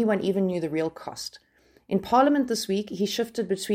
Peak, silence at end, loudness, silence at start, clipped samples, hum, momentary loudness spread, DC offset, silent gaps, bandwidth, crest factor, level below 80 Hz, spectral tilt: -8 dBFS; 0 s; -26 LUFS; 0 s; under 0.1%; none; 15 LU; under 0.1%; none; 16.5 kHz; 18 dB; -64 dBFS; -5 dB/octave